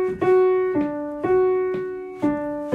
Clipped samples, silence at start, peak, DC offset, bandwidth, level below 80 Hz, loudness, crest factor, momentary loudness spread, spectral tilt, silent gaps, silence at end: under 0.1%; 0 s; -8 dBFS; under 0.1%; 4.4 kHz; -54 dBFS; -22 LUFS; 12 dB; 9 LU; -8.5 dB/octave; none; 0 s